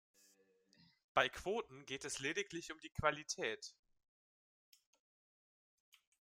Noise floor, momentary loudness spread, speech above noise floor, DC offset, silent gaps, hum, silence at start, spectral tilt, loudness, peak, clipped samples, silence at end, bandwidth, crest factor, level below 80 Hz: -74 dBFS; 12 LU; 32 dB; under 0.1%; none; none; 1.15 s; -2.5 dB/octave; -41 LUFS; -16 dBFS; under 0.1%; 2.65 s; 16 kHz; 28 dB; -68 dBFS